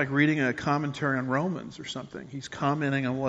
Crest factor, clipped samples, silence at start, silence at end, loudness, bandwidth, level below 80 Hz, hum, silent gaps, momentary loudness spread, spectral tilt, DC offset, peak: 18 dB; under 0.1%; 0 s; 0 s; -28 LUFS; 8 kHz; -62 dBFS; none; none; 14 LU; -5 dB/octave; under 0.1%; -10 dBFS